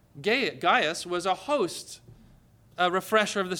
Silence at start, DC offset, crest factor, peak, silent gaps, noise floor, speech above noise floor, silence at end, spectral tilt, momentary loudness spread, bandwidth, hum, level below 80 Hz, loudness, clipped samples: 0.15 s; under 0.1%; 18 dB; -10 dBFS; none; -57 dBFS; 30 dB; 0 s; -3 dB/octave; 17 LU; 19.5 kHz; none; -66 dBFS; -26 LUFS; under 0.1%